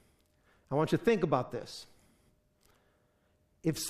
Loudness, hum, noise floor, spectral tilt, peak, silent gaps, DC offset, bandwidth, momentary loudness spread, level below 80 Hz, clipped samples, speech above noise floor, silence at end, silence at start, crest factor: -32 LUFS; none; -72 dBFS; -5.5 dB/octave; -14 dBFS; none; under 0.1%; 15 kHz; 16 LU; -66 dBFS; under 0.1%; 41 dB; 0 s; 0.7 s; 22 dB